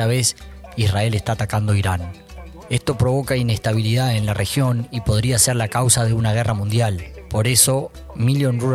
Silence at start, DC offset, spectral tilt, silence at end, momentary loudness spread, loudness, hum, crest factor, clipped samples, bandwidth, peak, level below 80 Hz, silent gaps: 0 s; under 0.1%; -4.5 dB/octave; 0 s; 11 LU; -19 LUFS; none; 18 dB; under 0.1%; 15 kHz; 0 dBFS; -40 dBFS; none